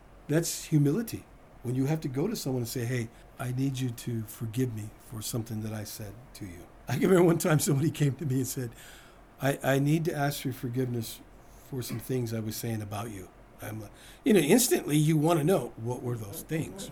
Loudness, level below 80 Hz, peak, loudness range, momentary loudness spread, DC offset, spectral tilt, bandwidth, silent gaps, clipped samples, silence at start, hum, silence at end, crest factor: -29 LUFS; -56 dBFS; -8 dBFS; 8 LU; 17 LU; under 0.1%; -5.5 dB/octave; over 20 kHz; none; under 0.1%; 0.1 s; none; 0 s; 22 dB